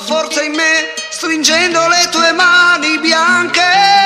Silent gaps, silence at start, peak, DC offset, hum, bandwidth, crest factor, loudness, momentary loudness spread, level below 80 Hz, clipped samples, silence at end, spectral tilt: none; 0 s; 0 dBFS; under 0.1%; none; 15 kHz; 12 dB; -10 LUFS; 7 LU; -56 dBFS; under 0.1%; 0 s; -0.5 dB/octave